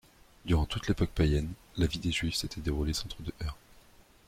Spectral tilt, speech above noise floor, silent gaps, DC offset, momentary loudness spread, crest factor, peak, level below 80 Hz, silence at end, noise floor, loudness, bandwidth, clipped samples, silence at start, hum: -5.5 dB/octave; 28 dB; none; under 0.1%; 12 LU; 18 dB; -14 dBFS; -40 dBFS; 0.75 s; -58 dBFS; -32 LUFS; 15.5 kHz; under 0.1%; 0.45 s; none